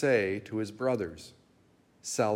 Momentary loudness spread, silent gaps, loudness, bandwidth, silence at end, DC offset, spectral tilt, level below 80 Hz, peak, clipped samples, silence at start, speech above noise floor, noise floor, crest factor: 18 LU; none; -32 LUFS; 16 kHz; 0 s; under 0.1%; -5 dB/octave; -70 dBFS; -14 dBFS; under 0.1%; 0 s; 34 dB; -64 dBFS; 18 dB